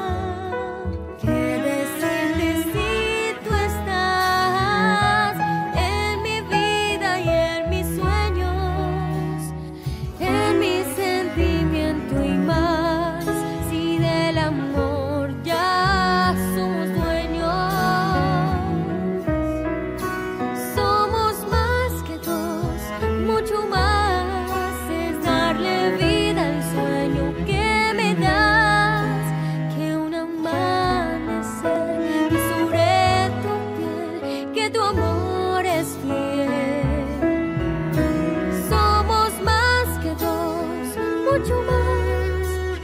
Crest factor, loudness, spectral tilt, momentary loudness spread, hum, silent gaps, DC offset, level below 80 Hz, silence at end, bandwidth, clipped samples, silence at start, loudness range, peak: 16 dB; -21 LUFS; -5.5 dB/octave; 8 LU; none; none; under 0.1%; -32 dBFS; 0 s; 16 kHz; under 0.1%; 0 s; 3 LU; -6 dBFS